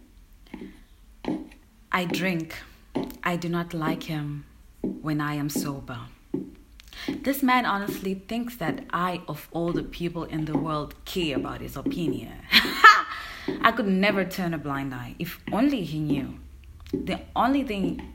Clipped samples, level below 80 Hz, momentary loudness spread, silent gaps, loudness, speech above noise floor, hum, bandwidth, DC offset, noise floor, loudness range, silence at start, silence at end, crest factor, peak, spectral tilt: under 0.1%; -48 dBFS; 14 LU; none; -26 LUFS; 24 dB; none; 16.5 kHz; under 0.1%; -51 dBFS; 10 LU; 0.35 s; 0 s; 26 dB; 0 dBFS; -5 dB/octave